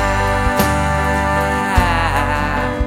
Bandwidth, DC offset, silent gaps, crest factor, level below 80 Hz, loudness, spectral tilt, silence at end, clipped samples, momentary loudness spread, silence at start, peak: 17 kHz; under 0.1%; none; 16 dB; -24 dBFS; -16 LUFS; -5.5 dB/octave; 0 s; under 0.1%; 2 LU; 0 s; 0 dBFS